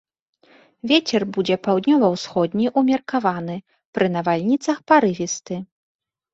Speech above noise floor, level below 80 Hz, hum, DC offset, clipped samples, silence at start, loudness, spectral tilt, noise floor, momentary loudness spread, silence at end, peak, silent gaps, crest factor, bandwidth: 35 dB; -64 dBFS; none; under 0.1%; under 0.1%; 0.85 s; -20 LUFS; -5 dB/octave; -54 dBFS; 14 LU; 0.7 s; -2 dBFS; 3.85-3.93 s; 18 dB; 8 kHz